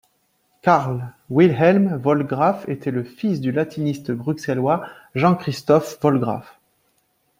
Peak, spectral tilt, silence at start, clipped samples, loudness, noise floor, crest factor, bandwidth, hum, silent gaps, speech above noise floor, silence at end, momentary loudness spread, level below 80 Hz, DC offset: -2 dBFS; -7.5 dB/octave; 0.65 s; under 0.1%; -20 LUFS; -66 dBFS; 18 dB; 16 kHz; none; none; 47 dB; 0.95 s; 10 LU; -60 dBFS; under 0.1%